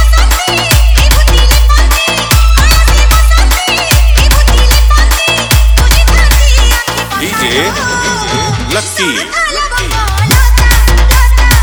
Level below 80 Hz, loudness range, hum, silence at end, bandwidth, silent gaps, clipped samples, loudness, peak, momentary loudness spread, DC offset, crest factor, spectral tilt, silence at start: -8 dBFS; 3 LU; none; 0 s; over 20 kHz; none; 0.3%; -8 LUFS; 0 dBFS; 5 LU; under 0.1%; 6 dB; -3.5 dB/octave; 0 s